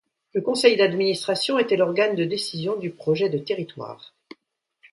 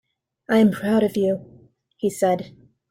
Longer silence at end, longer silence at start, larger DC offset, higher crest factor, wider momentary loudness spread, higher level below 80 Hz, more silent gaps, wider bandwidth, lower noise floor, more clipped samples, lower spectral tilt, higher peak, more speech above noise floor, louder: first, 0.85 s vs 0.4 s; second, 0.35 s vs 0.5 s; neither; about the same, 20 dB vs 16 dB; about the same, 12 LU vs 10 LU; second, -70 dBFS vs -62 dBFS; neither; second, 11.5 kHz vs 16 kHz; first, -70 dBFS vs -53 dBFS; neither; second, -4.5 dB/octave vs -6.5 dB/octave; first, -4 dBFS vs -8 dBFS; first, 48 dB vs 33 dB; about the same, -22 LUFS vs -21 LUFS